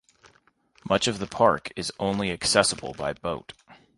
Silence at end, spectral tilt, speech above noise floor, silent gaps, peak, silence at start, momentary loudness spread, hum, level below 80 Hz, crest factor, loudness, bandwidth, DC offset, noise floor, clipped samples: 0.25 s; -3 dB/octave; 37 dB; none; -2 dBFS; 0.85 s; 12 LU; none; -54 dBFS; 24 dB; -25 LUFS; 11.5 kHz; under 0.1%; -63 dBFS; under 0.1%